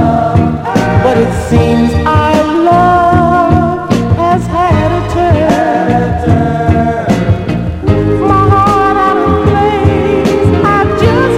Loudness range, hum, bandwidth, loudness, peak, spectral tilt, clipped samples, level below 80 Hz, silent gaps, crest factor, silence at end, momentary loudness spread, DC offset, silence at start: 2 LU; none; 13 kHz; -10 LUFS; 0 dBFS; -7.5 dB/octave; 0.6%; -24 dBFS; none; 8 dB; 0 s; 4 LU; under 0.1%; 0 s